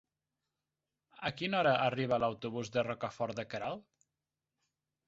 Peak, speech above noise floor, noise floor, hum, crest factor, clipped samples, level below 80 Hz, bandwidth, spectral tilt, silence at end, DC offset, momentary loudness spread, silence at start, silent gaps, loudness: -16 dBFS; over 56 dB; under -90 dBFS; none; 20 dB; under 0.1%; -70 dBFS; 7.6 kHz; -3.5 dB/octave; 1.25 s; under 0.1%; 11 LU; 1.2 s; none; -35 LUFS